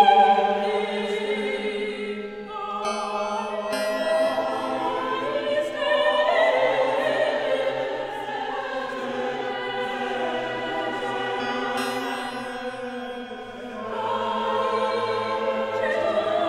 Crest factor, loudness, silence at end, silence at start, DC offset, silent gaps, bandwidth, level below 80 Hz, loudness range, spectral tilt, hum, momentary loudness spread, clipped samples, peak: 20 dB; -25 LUFS; 0 s; 0 s; under 0.1%; none; 16 kHz; -60 dBFS; 6 LU; -4 dB/octave; none; 11 LU; under 0.1%; -4 dBFS